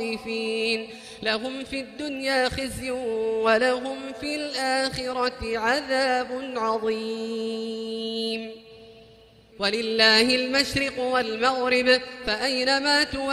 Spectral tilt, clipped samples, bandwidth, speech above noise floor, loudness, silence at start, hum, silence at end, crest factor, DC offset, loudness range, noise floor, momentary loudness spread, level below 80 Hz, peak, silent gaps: -3 dB/octave; under 0.1%; 14.5 kHz; 27 dB; -24 LUFS; 0 s; none; 0 s; 20 dB; under 0.1%; 7 LU; -52 dBFS; 11 LU; -52 dBFS; -4 dBFS; none